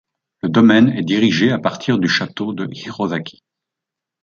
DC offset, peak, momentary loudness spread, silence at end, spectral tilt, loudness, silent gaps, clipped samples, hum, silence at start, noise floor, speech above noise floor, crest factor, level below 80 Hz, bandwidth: under 0.1%; -2 dBFS; 14 LU; 0.9 s; -6 dB/octave; -16 LUFS; none; under 0.1%; none; 0.45 s; -84 dBFS; 68 dB; 16 dB; -58 dBFS; 7.2 kHz